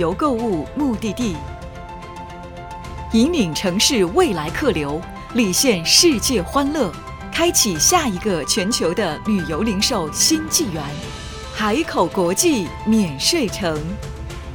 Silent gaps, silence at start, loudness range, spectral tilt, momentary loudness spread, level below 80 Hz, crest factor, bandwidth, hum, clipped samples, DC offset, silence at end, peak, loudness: none; 0 s; 4 LU; -3 dB/octave; 17 LU; -38 dBFS; 18 dB; over 20 kHz; none; under 0.1%; under 0.1%; 0 s; 0 dBFS; -18 LUFS